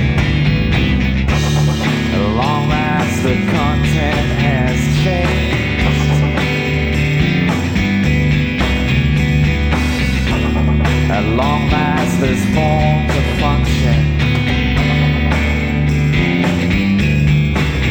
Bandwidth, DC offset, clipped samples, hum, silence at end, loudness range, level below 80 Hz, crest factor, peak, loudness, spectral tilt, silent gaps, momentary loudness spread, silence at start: 19.5 kHz; under 0.1%; under 0.1%; none; 0 s; 1 LU; -22 dBFS; 12 dB; -2 dBFS; -15 LUFS; -6.5 dB/octave; none; 2 LU; 0 s